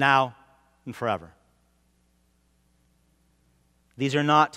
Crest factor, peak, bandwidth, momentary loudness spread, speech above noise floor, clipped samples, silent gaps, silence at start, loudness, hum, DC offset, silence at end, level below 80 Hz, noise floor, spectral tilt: 24 dB; -4 dBFS; 14.5 kHz; 18 LU; 43 dB; under 0.1%; none; 0 s; -25 LUFS; none; under 0.1%; 0 s; -68 dBFS; -66 dBFS; -5.5 dB/octave